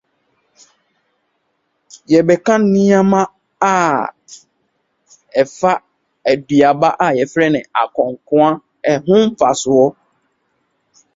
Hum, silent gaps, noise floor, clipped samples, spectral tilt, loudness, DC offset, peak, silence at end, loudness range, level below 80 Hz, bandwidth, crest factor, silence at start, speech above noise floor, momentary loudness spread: none; none; -67 dBFS; under 0.1%; -6 dB/octave; -14 LUFS; under 0.1%; 0 dBFS; 1.25 s; 3 LU; -58 dBFS; 8 kHz; 16 dB; 2.1 s; 54 dB; 8 LU